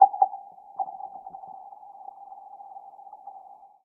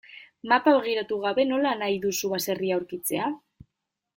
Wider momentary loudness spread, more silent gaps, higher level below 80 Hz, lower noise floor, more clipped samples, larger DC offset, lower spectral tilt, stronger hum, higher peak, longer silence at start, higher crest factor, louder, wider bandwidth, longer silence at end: first, 20 LU vs 8 LU; neither; second, -86 dBFS vs -68 dBFS; second, -49 dBFS vs -83 dBFS; neither; neither; first, -8 dB/octave vs -3.5 dB/octave; neither; about the same, -4 dBFS vs -6 dBFS; about the same, 0 s vs 0.1 s; first, 26 dB vs 20 dB; second, -29 LUFS vs -25 LUFS; second, 1.3 kHz vs 17 kHz; second, 0.45 s vs 0.8 s